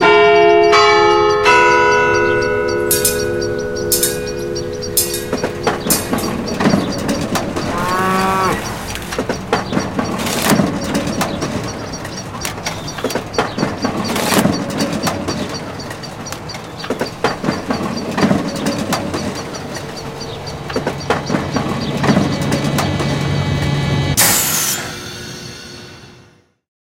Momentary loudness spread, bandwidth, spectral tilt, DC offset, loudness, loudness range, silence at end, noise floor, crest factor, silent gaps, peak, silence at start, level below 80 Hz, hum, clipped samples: 15 LU; 17 kHz; -4 dB/octave; under 0.1%; -16 LUFS; 7 LU; 0.75 s; -48 dBFS; 16 dB; none; 0 dBFS; 0 s; -38 dBFS; none; under 0.1%